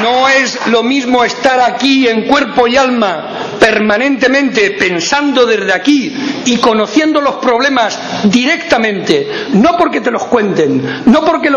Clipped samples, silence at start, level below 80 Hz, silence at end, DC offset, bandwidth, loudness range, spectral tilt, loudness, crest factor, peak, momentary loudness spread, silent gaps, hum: 0.6%; 0 s; -46 dBFS; 0 s; under 0.1%; 10.5 kHz; 1 LU; -4 dB/octave; -10 LUFS; 10 dB; 0 dBFS; 4 LU; none; none